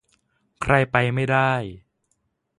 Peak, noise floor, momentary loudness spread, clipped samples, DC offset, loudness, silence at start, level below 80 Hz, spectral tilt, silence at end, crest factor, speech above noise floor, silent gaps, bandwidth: -2 dBFS; -72 dBFS; 11 LU; under 0.1%; under 0.1%; -21 LUFS; 0.6 s; -48 dBFS; -6.5 dB/octave; 0.8 s; 22 dB; 52 dB; none; 11.5 kHz